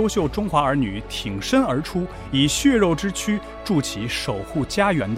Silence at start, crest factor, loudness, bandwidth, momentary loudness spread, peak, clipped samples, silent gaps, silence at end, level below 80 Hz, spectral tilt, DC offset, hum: 0 s; 16 dB; -22 LUFS; 16 kHz; 9 LU; -4 dBFS; under 0.1%; none; 0 s; -40 dBFS; -5 dB/octave; under 0.1%; none